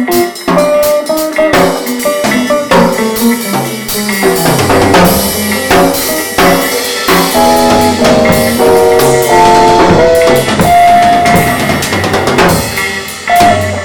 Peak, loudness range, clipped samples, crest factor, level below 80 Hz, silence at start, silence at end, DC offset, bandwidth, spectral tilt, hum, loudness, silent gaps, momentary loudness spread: 0 dBFS; 4 LU; 0.9%; 8 dB; -32 dBFS; 0 s; 0 s; 1%; 19.5 kHz; -4 dB/octave; none; -8 LUFS; none; 6 LU